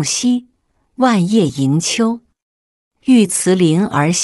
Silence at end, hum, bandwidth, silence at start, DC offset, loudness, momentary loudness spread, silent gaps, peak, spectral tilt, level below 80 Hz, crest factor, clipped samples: 0 s; none; 12.5 kHz; 0 s; under 0.1%; -15 LUFS; 7 LU; 2.42-2.91 s; -2 dBFS; -4.5 dB/octave; -56 dBFS; 14 dB; under 0.1%